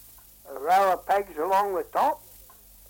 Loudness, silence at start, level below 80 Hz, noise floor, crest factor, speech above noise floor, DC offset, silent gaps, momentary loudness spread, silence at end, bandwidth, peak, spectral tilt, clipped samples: -25 LUFS; 0.45 s; -60 dBFS; -51 dBFS; 14 dB; 27 dB; under 0.1%; none; 13 LU; 0.7 s; 17 kHz; -12 dBFS; -3.5 dB/octave; under 0.1%